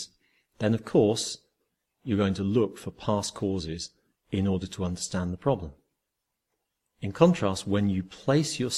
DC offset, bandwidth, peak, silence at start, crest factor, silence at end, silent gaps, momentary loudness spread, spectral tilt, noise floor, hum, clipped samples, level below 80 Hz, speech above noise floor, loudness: under 0.1%; 13.5 kHz; -4 dBFS; 0 s; 24 dB; 0 s; none; 14 LU; -5.5 dB/octave; -83 dBFS; none; under 0.1%; -58 dBFS; 56 dB; -28 LUFS